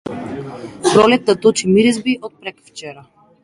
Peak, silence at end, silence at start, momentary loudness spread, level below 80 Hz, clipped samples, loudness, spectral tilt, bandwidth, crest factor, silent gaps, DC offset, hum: 0 dBFS; 0.45 s; 0.05 s; 21 LU; -54 dBFS; under 0.1%; -14 LUFS; -4.5 dB/octave; 11.5 kHz; 16 dB; none; under 0.1%; none